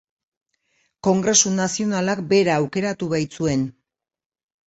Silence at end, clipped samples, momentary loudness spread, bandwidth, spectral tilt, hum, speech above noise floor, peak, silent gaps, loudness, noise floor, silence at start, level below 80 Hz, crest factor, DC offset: 0.95 s; under 0.1%; 8 LU; 8.2 kHz; -4 dB/octave; none; 48 dB; -4 dBFS; none; -20 LUFS; -68 dBFS; 1.05 s; -56 dBFS; 18 dB; under 0.1%